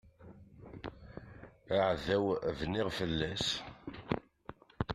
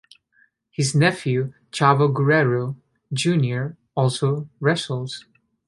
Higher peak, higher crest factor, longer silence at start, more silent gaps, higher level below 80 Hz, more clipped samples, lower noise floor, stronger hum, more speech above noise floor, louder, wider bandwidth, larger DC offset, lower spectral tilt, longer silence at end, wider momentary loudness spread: second, -16 dBFS vs -2 dBFS; about the same, 22 dB vs 20 dB; second, 0.2 s vs 0.8 s; neither; first, -56 dBFS vs -62 dBFS; neither; second, -56 dBFS vs -62 dBFS; neither; second, 23 dB vs 42 dB; second, -35 LUFS vs -21 LUFS; first, 13.5 kHz vs 11.5 kHz; neither; about the same, -5 dB/octave vs -5.5 dB/octave; second, 0 s vs 0.45 s; first, 22 LU vs 13 LU